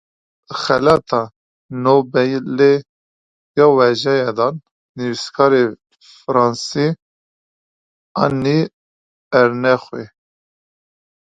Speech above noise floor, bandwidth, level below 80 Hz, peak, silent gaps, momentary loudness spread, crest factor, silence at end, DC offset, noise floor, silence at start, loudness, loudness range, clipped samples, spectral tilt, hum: over 75 dB; 9.2 kHz; -56 dBFS; 0 dBFS; 1.36-1.69 s, 2.89-3.54 s, 4.71-4.95 s, 7.02-8.15 s, 8.73-9.31 s; 15 LU; 18 dB; 1.2 s; under 0.1%; under -90 dBFS; 0.5 s; -16 LUFS; 4 LU; under 0.1%; -6 dB/octave; none